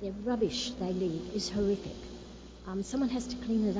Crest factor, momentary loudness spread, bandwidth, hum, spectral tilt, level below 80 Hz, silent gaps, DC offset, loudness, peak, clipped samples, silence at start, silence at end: 14 dB; 15 LU; 7.8 kHz; none; -5.5 dB/octave; -52 dBFS; none; under 0.1%; -33 LUFS; -18 dBFS; under 0.1%; 0 s; 0 s